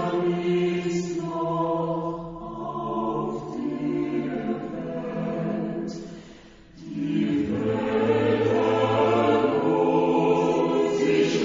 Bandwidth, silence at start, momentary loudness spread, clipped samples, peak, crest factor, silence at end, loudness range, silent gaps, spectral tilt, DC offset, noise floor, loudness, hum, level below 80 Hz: 7.6 kHz; 0 s; 11 LU; under 0.1%; -10 dBFS; 16 dB; 0 s; 8 LU; none; -7 dB/octave; under 0.1%; -47 dBFS; -25 LUFS; none; -56 dBFS